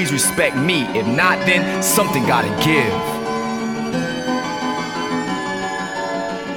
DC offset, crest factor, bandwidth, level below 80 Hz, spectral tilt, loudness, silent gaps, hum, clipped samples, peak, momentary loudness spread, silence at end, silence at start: under 0.1%; 18 dB; 19.5 kHz; -48 dBFS; -3.5 dB/octave; -18 LUFS; none; none; under 0.1%; 0 dBFS; 8 LU; 0 s; 0 s